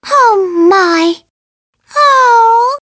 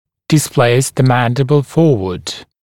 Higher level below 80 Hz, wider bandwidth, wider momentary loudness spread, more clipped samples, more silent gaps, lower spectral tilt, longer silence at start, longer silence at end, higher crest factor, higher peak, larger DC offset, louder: second, -62 dBFS vs -46 dBFS; second, 8 kHz vs 17 kHz; about the same, 9 LU vs 9 LU; neither; first, 1.30-1.73 s vs none; second, -2 dB/octave vs -5.5 dB/octave; second, 0.05 s vs 0.3 s; second, 0.05 s vs 0.2 s; about the same, 10 dB vs 14 dB; about the same, 0 dBFS vs 0 dBFS; neither; first, -8 LUFS vs -13 LUFS